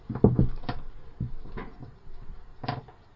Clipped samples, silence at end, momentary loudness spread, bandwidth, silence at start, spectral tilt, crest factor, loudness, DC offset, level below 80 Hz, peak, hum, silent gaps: under 0.1%; 0.25 s; 26 LU; 5.8 kHz; 0 s; -11 dB/octave; 26 dB; -30 LUFS; under 0.1%; -38 dBFS; -4 dBFS; none; none